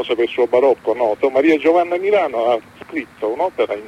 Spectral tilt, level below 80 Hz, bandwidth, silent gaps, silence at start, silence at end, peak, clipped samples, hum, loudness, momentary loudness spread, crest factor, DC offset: -5.5 dB/octave; -60 dBFS; 11 kHz; none; 0 s; 0 s; -2 dBFS; under 0.1%; none; -17 LUFS; 10 LU; 14 dB; under 0.1%